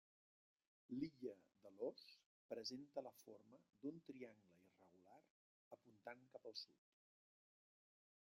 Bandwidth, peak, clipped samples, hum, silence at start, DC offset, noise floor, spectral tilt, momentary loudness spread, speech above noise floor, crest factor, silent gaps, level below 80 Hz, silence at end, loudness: 13.5 kHz; -36 dBFS; under 0.1%; none; 0.9 s; under 0.1%; -74 dBFS; -4.5 dB/octave; 16 LU; 17 dB; 22 dB; 2.26-2.49 s, 5.30-5.71 s; under -90 dBFS; 1.6 s; -55 LUFS